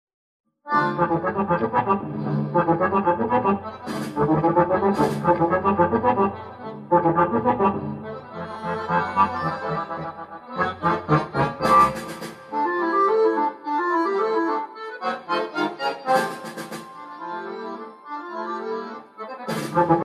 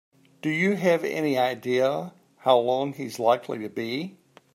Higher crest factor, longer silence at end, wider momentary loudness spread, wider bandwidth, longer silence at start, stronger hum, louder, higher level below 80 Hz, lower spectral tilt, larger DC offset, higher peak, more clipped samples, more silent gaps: about the same, 18 dB vs 20 dB; second, 0 s vs 0.45 s; first, 15 LU vs 11 LU; second, 13.5 kHz vs 16 kHz; first, 0.65 s vs 0.45 s; neither; first, -22 LUFS vs -25 LUFS; first, -54 dBFS vs -76 dBFS; first, -7 dB/octave vs -5.5 dB/octave; neither; about the same, -4 dBFS vs -6 dBFS; neither; neither